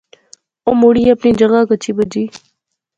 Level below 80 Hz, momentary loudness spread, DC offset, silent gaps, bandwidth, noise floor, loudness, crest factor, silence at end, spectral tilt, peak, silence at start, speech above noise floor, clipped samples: -46 dBFS; 11 LU; under 0.1%; none; 7.8 kHz; -68 dBFS; -13 LUFS; 14 dB; 0.7 s; -6.5 dB/octave; 0 dBFS; 0.65 s; 57 dB; under 0.1%